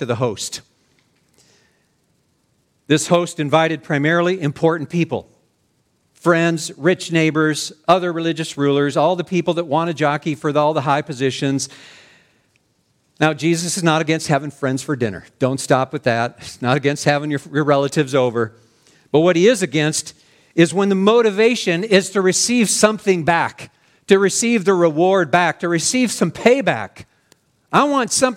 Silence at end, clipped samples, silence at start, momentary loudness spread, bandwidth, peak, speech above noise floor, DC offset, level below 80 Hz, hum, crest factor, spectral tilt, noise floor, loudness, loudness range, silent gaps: 0 s; under 0.1%; 0 s; 8 LU; 16.5 kHz; 0 dBFS; 47 dB; under 0.1%; -62 dBFS; none; 18 dB; -4.5 dB/octave; -64 dBFS; -17 LUFS; 5 LU; none